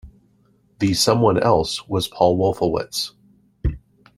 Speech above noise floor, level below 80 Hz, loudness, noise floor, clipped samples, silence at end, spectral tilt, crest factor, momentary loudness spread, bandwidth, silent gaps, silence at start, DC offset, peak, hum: 40 dB; -36 dBFS; -20 LUFS; -59 dBFS; under 0.1%; 0.4 s; -5 dB/octave; 18 dB; 12 LU; 16 kHz; none; 0.05 s; under 0.1%; -2 dBFS; none